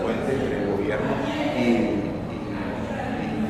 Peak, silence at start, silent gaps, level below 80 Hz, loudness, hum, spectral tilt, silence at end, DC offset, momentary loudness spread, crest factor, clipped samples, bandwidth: -10 dBFS; 0 s; none; -44 dBFS; -25 LUFS; none; -7 dB/octave; 0 s; under 0.1%; 8 LU; 14 dB; under 0.1%; 13.5 kHz